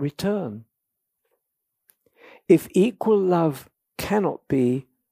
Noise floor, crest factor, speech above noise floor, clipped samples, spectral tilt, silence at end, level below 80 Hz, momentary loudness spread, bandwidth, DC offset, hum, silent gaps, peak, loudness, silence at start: -80 dBFS; 20 dB; 59 dB; under 0.1%; -7 dB/octave; 0.3 s; -58 dBFS; 15 LU; 15.5 kHz; under 0.1%; none; none; -4 dBFS; -22 LUFS; 0 s